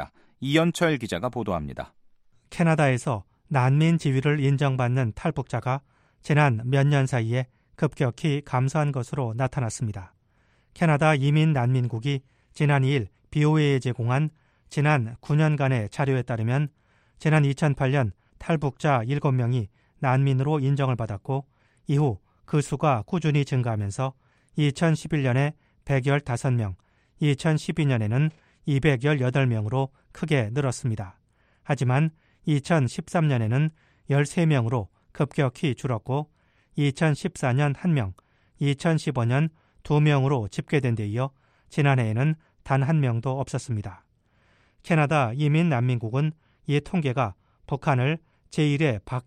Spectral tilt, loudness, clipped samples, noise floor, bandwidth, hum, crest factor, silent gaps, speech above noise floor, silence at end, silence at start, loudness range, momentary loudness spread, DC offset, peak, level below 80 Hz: -7 dB/octave; -25 LUFS; under 0.1%; -64 dBFS; 10.5 kHz; none; 18 dB; none; 41 dB; 0.05 s; 0 s; 2 LU; 10 LU; under 0.1%; -6 dBFS; -54 dBFS